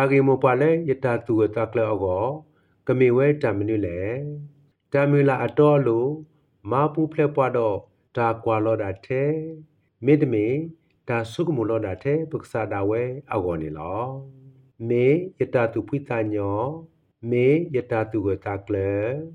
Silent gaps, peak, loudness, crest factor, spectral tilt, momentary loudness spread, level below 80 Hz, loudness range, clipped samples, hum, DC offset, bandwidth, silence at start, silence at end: none; -6 dBFS; -23 LUFS; 18 dB; -9 dB/octave; 11 LU; -62 dBFS; 4 LU; under 0.1%; none; under 0.1%; 10.5 kHz; 0 s; 0 s